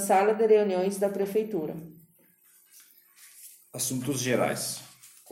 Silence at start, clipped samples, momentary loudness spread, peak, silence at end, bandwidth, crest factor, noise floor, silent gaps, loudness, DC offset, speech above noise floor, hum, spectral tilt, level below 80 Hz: 0 s; under 0.1%; 23 LU; -10 dBFS; 0.25 s; 16.5 kHz; 18 dB; -62 dBFS; none; -27 LUFS; under 0.1%; 36 dB; none; -4 dB/octave; -72 dBFS